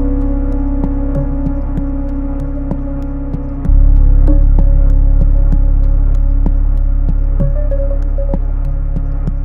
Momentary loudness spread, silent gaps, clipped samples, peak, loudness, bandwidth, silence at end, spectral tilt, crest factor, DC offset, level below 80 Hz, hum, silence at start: 8 LU; none; under 0.1%; 0 dBFS; -16 LUFS; 1.9 kHz; 0 s; -11.5 dB/octave; 10 dB; under 0.1%; -10 dBFS; none; 0 s